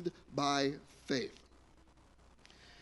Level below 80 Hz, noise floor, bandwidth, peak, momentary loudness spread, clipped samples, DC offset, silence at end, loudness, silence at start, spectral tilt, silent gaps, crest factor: -66 dBFS; -63 dBFS; 11.5 kHz; -18 dBFS; 22 LU; under 0.1%; under 0.1%; 0.05 s; -36 LUFS; 0 s; -4 dB/octave; none; 22 dB